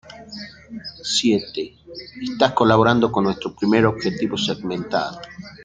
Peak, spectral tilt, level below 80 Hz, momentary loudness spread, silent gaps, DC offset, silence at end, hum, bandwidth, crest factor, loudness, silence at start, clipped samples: 0 dBFS; -5 dB/octave; -52 dBFS; 20 LU; none; under 0.1%; 0 s; none; 9.4 kHz; 20 dB; -20 LUFS; 0.05 s; under 0.1%